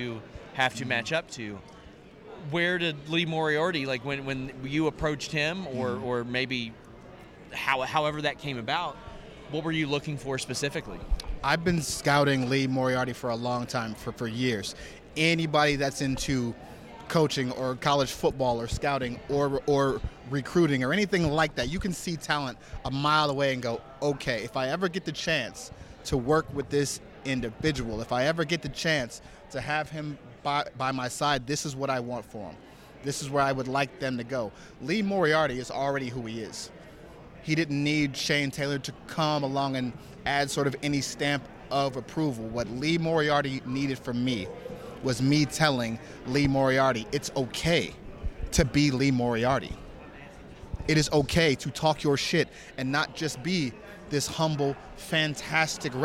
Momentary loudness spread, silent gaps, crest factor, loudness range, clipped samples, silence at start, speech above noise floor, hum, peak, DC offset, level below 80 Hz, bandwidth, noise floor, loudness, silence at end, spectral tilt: 14 LU; none; 20 dB; 4 LU; under 0.1%; 0 s; 21 dB; none; -10 dBFS; under 0.1%; -46 dBFS; 16.5 kHz; -49 dBFS; -28 LUFS; 0 s; -4.5 dB/octave